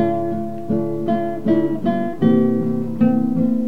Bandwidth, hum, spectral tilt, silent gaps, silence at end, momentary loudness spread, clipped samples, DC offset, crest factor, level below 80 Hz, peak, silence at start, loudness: 4.7 kHz; none; -9.5 dB/octave; none; 0 s; 6 LU; under 0.1%; 3%; 14 dB; -54 dBFS; -4 dBFS; 0 s; -19 LUFS